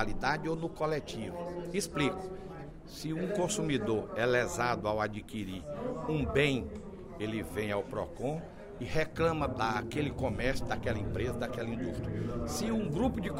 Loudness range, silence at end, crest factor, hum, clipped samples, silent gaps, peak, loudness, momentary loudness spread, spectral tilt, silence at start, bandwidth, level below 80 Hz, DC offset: 3 LU; 0 s; 20 dB; none; under 0.1%; none; -14 dBFS; -34 LUFS; 10 LU; -5.5 dB/octave; 0 s; 16 kHz; -48 dBFS; under 0.1%